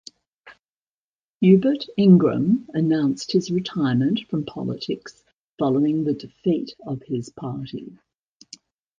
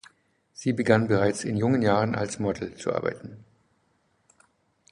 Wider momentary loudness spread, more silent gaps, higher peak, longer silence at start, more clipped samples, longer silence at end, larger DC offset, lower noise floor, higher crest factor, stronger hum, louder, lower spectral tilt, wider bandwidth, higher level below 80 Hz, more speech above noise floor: first, 16 LU vs 11 LU; first, 0.59-0.63 s, 0.70-1.40 s, 5.34-5.56 s vs none; first, -2 dBFS vs -6 dBFS; second, 0.45 s vs 0.6 s; neither; second, 1.1 s vs 1.55 s; neither; first, under -90 dBFS vs -69 dBFS; about the same, 20 dB vs 22 dB; neither; first, -22 LUFS vs -25 LUFS; first, -7.5 dB/octave vs -6 dB/octave; second, 7.6 kHz vs 11.5 kHz; about the same, -62 dBFS vs -58 dBFS; first, over 69 dB vs 44 dB